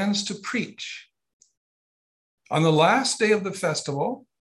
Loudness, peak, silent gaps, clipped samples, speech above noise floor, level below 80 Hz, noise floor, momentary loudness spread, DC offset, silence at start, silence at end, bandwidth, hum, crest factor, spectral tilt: -23 LUFS; -6 dBFS; 1.33-1.40 s, 1.57-2.38 s; under 0.1%; over 66 dB; -72 dBFS; under -90 dBFS; 15 LU; under 0.1%; 0 s; 0.3 s; 12.5 kHz; none; 20 dB; -4.5 dB/octave